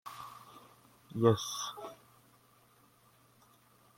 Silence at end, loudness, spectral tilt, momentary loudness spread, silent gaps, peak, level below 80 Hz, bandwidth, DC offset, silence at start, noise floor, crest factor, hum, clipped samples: 2.05 s; -33 LUFS; -5.5 dB/octave; 25 LU; none; -12 dBFS; -74 dBFS; 16.5 kHz; under 0.1%; 0.05 s; -66 dBFS; 26 dB; none; under 0.1%